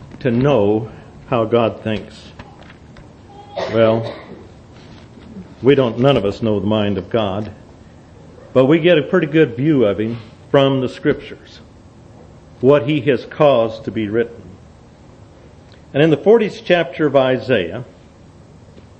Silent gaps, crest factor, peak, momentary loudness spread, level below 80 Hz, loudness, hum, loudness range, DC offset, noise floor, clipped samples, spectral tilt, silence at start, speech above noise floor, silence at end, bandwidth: none; 18 dB; 0 dBFS; 18 LU; -48 dBFS; -16 LUFS; none; 5 LU; under 0.1%; -43 dBFS; under 0.1%; -8 dB/octave; 0 s; 28 dB; 0.2 s; 8.6 kHz